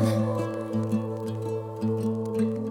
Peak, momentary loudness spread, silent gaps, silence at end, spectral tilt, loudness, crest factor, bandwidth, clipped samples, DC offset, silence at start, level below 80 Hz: -12 dBFS; 5 LU; none; 0 s; -8 dB/octave; -29 LUFS; 16 dB; 16.5 kHz; under 0.1%; under 0.1%; 0 s; -68 dBFS